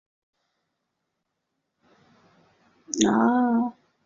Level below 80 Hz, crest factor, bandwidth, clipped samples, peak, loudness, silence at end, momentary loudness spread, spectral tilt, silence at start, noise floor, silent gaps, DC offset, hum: -68 dBFS; 24 dB; 7.6 kHz; under 0.1%; -4 dBFS; -23 LUFS; 0.35 s; 11 LU; -4 dB/octave; 2.9 s; -80 dBFS; none; under 0.1%; none